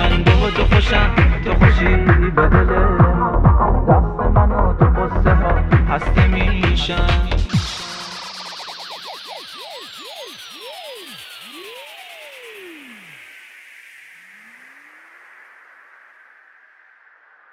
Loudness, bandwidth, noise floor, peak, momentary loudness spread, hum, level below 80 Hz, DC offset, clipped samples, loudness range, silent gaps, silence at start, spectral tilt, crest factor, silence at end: -16 LUFS; 12 kHz; -51 dBFS; 0 dBFS; 21 LU; none; -20 dBFS; under 0.1%; under 0.1%; 21 LU; none; 0 s; -6.5 dB/octave; 18 dB; 4.6 s